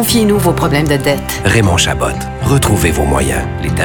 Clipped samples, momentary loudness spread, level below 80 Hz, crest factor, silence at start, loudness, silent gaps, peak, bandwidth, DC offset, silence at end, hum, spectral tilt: under 0.1%; 7 LU; -24 dBFS; 12 dB; 0 s; -13 LUFS; none; 0 dBFS; over 20 kHz; under 0.1%; 0 s; none; -4.5 dB/octave